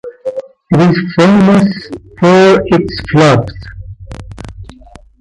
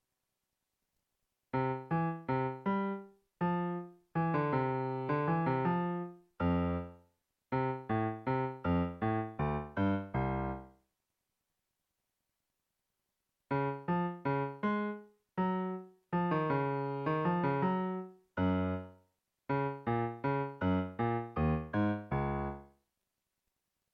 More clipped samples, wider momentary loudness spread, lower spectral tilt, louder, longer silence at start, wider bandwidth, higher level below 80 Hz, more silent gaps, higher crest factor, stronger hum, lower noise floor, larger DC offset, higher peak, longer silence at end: neither; first, 23 LU vs 9 LU; second, -7 dB/octave vs -10 dB/octave; first, -9 LUFS vs -35 LUFS; second, 0.05 s vs 1.55 s; first, 11 kHz vs 5.2 kHz; first, -34 dBFS vs -54 dBFS; neither; about the same, 12 dB vs 16 dB; neither; second, -37 dBFS vs -86 dBFS; neither; first, 0 dBFS vs -20 dBFS; second, 0.55 s vs 1.25 s